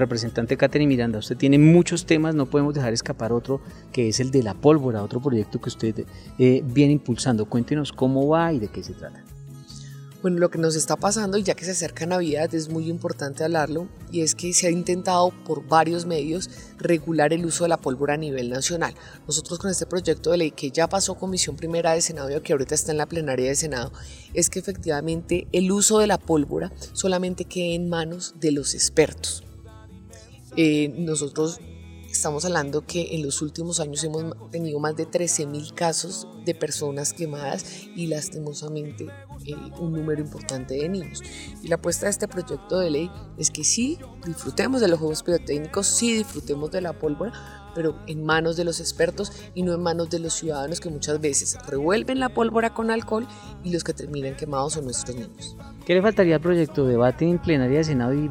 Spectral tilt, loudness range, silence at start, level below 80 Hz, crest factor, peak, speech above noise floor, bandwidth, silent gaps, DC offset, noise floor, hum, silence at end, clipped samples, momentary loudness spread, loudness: -4.5 dB/octave; 5 LU; 0 s; -48 dBFS; 20 dB; -4 dBFS; 22 dB; 17 kHz; none; under 0.1%; -45 dBFS; none; 0 s; under 0.1%; 12 LU; -23 LUFS